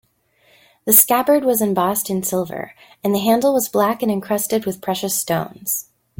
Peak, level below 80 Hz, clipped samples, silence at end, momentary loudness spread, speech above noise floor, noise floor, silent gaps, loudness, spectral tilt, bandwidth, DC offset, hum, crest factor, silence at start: 0 dBFS; -60 dBFS; under 0.1%; 0.4 s; 12 LU; 40 dB; -59 dBFS; none; -18 LUFS; -4 dB/octave; 17 kHz; under 0.1%; none; 20 dB; 0.85 s